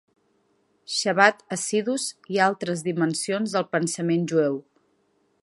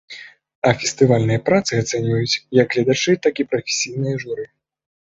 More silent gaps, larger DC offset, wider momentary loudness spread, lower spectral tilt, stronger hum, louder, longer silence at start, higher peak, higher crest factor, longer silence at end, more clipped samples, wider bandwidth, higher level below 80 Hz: second, none vs 0.55-0.62 s; neither; second, 9 LU vs 12 LU; about the same, -4 dB/octave vs -5 dB/octave; neither; second, -24 LUFS vs -19 LUFS; first, 0.9 s vs 0.1 s; about the same, -2 dBFS vs -2 dBFS; first, 24 dB vs 18 dB; about the same, 0.8 s vs 0.7 s; neither; first, 11.5 kHz vs 8 kHz; second, -74 dBFS vs -54 dBFS